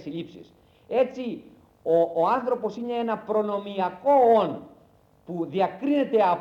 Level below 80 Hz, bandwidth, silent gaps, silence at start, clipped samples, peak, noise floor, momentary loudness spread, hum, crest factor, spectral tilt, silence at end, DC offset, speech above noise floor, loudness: -68 dBFS; 7.2 kHz; none; 0 s; under 0.1%; -10 dBFS; -58 dBFS; 16 LU; none; 16 dB; -7.5 dB/octave; 0 s; under 0.1%; 34 dB; -24 LUFS